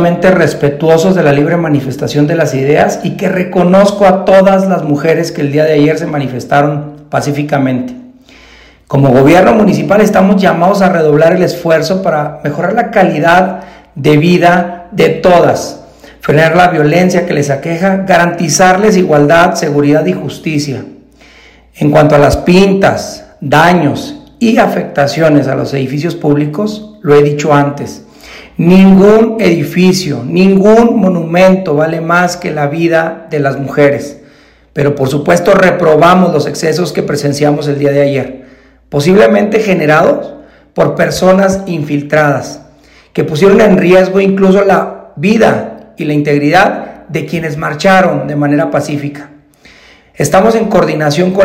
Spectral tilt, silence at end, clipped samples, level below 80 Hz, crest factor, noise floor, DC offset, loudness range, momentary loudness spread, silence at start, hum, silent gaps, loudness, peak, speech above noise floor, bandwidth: -6 dB/octave; 0 s; 4%; -38 dBFS; 8 dB; -42 dBFS; under 0.1%; 4 LU; 11 LU; 0 s; none; none; -9 LUFS; 0 dBFS; 34 dB; 16 kHz